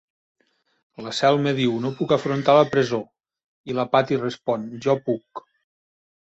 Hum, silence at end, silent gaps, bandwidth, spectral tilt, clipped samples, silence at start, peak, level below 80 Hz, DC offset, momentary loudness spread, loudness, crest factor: none; 0.9 s; 3.44-3.64 s; 8.2 kHz; -6 dB/octave; under 0.1%; 1 s; -2 dBFS; -64 dBFS; under 0.1%; 12 LU; -22 LUFS; 22 dB